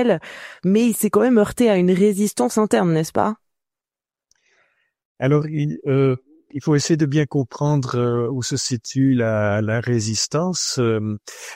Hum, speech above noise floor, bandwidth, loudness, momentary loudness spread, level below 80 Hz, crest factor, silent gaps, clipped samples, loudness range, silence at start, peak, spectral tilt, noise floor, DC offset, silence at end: none; over 71 dB; 16 kHz; -19 LUFS; 8 LU; -56 dBFS; 16 dB; 5.05-5.15 s; under 0.1%; 6 LU; 0 s; -4 dBFS; -5.5 dB/octave; under -90 dBFS; under 0.1%; 0 s